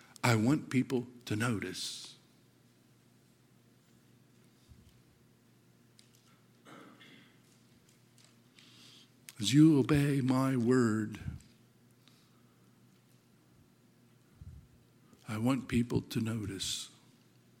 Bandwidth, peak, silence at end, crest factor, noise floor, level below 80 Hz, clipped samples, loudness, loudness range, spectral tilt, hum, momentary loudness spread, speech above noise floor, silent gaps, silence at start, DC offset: 16.5 kHz; -12 dBFS; 0.7 s; 24 dB; -65 dBFS; -62 dBFS; under 0.1%; -31 LUFS; 15 LU; -6 dB/octave; none; 27 LU; 35 dB; none; 0.25 s; under 0.1%